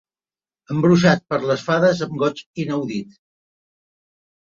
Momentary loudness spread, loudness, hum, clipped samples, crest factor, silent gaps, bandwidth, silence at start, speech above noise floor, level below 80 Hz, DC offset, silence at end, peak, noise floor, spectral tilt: 13 LU; -19 LUFS; none; under 0.1%; 20 dB; 2.46-2.54 s; 7.4 kHz; 0.7 s; over 71 dB; -60 dBFS; under 0.1%; 1.45 s; -2 dBFS; under -90 dBFS; -6.5 dB/octave